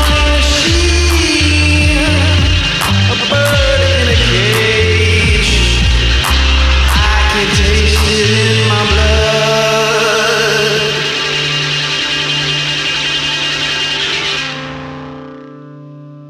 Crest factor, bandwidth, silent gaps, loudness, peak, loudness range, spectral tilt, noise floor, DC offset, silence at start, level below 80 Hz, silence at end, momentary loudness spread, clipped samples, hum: 12 dB; 14.5 kHz; none; -11 LUFS; 0 dBFS; 3 LU; -4 dB/octave; -32 dBFS; under 0.1%; 0 s; -18 dBFS; 0 s; 3 LU; under 0.1%; none